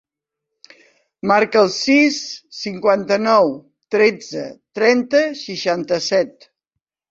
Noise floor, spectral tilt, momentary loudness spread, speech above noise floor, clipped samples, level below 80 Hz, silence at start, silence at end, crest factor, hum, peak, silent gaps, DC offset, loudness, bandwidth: -82 dBFS; -4 dB/octave; 14 LU; 65 dB; under 0.1%; -64 dBFS; 1.25 s; 0.8 s; 16 dB; none; -2 dBFS; none; under 0.1%; -17 LUFS; 8 kHz